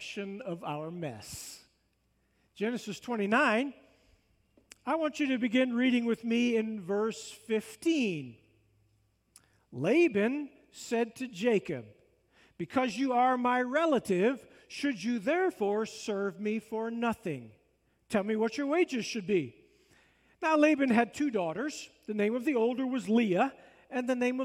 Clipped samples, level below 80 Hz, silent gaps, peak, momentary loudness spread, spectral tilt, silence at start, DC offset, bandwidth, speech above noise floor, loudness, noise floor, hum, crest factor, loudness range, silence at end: under 0.1%; -74 dBFS; none; -14 dBFS; 14 LU; -5 dB/octave; 0 s; under 0.1%; 15.5 kHz; 44 dB; -31 LUFS; -74 dBFS; none; 18 dB; 4 LU; 0 s